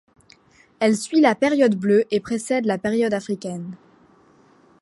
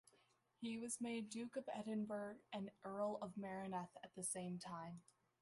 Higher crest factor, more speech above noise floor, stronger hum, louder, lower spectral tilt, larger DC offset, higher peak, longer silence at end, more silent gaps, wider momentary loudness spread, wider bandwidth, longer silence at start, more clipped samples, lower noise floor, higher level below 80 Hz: about the same, 18 dB vs 18 dB; first, 35 dB vs 30 dB; neither; first, -20 LUFS vs -48 LUFS; about the same, -5.5 dB/octave vs -4.5 dB/octave; neither; first, -4 dBFS vs -32 dBFS; first, 1.05 s vs 0.4 s; neither; first, 11 LU vs 7 LU; about the same, 11.5 kHz vs 11.5 kHz; first, 0.8 s vs 0.6 s; neither; second, -54 dBFS vs -78 dBFS; first, -64 dBFS vs -86 dBFS